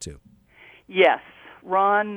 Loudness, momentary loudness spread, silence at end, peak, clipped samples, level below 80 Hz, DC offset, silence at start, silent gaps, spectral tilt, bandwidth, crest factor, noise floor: -21 LUFS; 11 LU; 0 s; -4 dBFS; under 0.1%; -56 dBFS; under 0.1%; 0 s; none; -4 dB/octave; 11 kHz; 20 dB; -53 dBFS